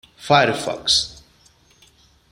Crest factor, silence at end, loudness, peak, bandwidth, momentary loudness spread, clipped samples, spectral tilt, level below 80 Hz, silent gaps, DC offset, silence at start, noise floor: 20 dB; 1.2 s; -18 LUFS; -2 dBFS; 16 kHz; 7 LU; under 0.1%; -3 dB/octave; -52 dBFS; none; under 0.1%; 0.2 s; -55 dBFS